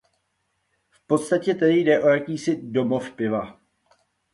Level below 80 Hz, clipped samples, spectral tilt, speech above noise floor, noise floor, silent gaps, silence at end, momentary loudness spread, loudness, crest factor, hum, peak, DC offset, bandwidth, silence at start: -64 dBFS; under 0.1%; -6 dB/octave; 52 dB; -73 dBFS; none; 0.8 s; 8 LU; -22 LUFS; 18 dB; none; -6 dBFS; under 0.1%; 11.5 kHz; 1.1 s